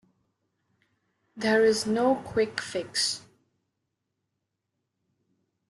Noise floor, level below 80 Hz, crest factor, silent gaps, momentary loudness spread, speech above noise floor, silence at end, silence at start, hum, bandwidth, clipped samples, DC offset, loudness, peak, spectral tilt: -82 dBFS; -68 dBFS; 20 dB; none; 9 LU; 57 dB; 2.5 s; 1.35 s; none; 12.5 kHz; under 0.1%; under 0.1%; -26 LUFS; -10 dBFS; -3 dB/octave